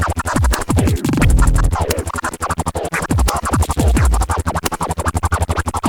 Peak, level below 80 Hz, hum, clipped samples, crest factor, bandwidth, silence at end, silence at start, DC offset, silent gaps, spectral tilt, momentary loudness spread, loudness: 0 dBFS; -20 dBFS; none; under 0.1%; 16 dB; over 20 kHz; 0 s; 0 s; under 0.1%; none; -5 dB/octave; 6 LU; -17 LUFS